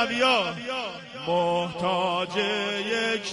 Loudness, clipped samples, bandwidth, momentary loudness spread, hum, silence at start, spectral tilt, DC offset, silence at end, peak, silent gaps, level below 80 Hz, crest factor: -26 LUFS; under 0.1%; 11.5 kHz; 9 LU; none; 0 s; -4 dB/octave; under 0.1%; 0 s; -8 dBFS; none; -64 dBFS; 18 dB